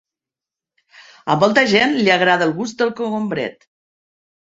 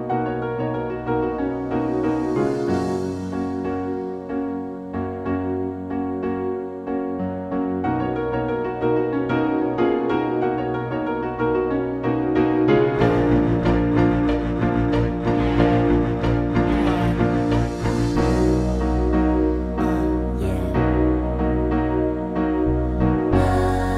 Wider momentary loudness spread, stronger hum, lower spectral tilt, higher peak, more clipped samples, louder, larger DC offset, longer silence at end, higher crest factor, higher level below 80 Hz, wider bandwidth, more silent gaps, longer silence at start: first, 11 LU vs 8 LU; neither; second, -4.5 dB/octave vs -8.5 dB/octave; about the same, -2 dBFS vs -4 dBFS; neither; first, -16 LUFS vs -22 LUFS; neither; first, 0.9 s vs 0 s; about the same, 18 dB vs 16 dB; second, -62 dBFS vs -30 dBFS; second, 8 kHz vs 11 kHz; neither; first, 1 s vs 0 s